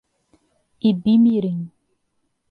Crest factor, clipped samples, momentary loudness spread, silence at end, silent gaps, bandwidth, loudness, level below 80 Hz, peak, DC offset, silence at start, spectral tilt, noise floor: 14 dB; under 0.1%; 14 LU; 0.85 s; none; 4.7 kHz; -19 LUFS; -62 dBFS; -8 dBFS; under 0.1%; 0.85 s; -10 dB/octave; -71 dBFS